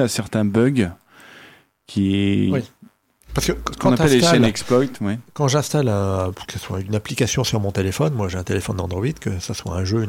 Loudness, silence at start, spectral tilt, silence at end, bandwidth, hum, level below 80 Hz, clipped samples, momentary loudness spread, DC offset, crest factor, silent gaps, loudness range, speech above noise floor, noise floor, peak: -20 LUFS; 0 s; -5.5 dB/octave; 0 s; 17 kHz; none; -42 dBFS; under 0.1%; 11 LU; under 0.1%; 16 dB; none; 4 LU; 32 dB; -51 dBFS; -4 dBFS